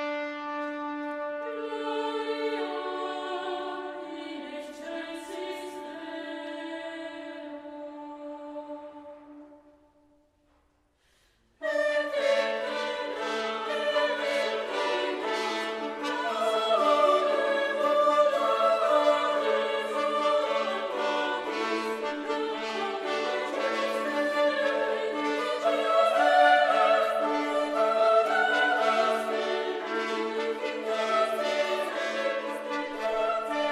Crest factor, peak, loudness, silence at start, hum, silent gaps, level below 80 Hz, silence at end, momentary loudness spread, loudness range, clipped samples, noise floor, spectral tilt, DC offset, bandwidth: 20 dB; -8 dBFS; -27 LUFS; 0 s; none; none; -74 dBFS; 0 s; 15 LU; 15 LU; under 0.1%; -68 dBFS; -2.5 dB/octave; under 0.1%; 14.5 kHz